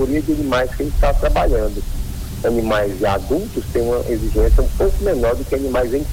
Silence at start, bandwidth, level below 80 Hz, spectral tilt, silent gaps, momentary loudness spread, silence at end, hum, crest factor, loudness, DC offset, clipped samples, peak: 0 s; 16.5 kHz; -20 dBFS; -6.5 dB/octave; none; 5 LU; 0 s; none; 14 dB; -19 LUFS; under 0.1%; under 0.1%; -4 dBFS